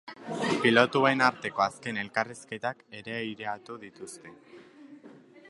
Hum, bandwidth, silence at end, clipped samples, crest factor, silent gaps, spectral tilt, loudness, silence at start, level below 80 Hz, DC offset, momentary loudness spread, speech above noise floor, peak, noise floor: none; 11.5 kHz; 0.1 s; under 0.1%; 26 dB; none; -4.5 dB/octave; -28 LUFS; 0.05 s; -74 dBFS; under 0.1%; 21 LU; 23 dB; -4 dBFS; -52 dBFS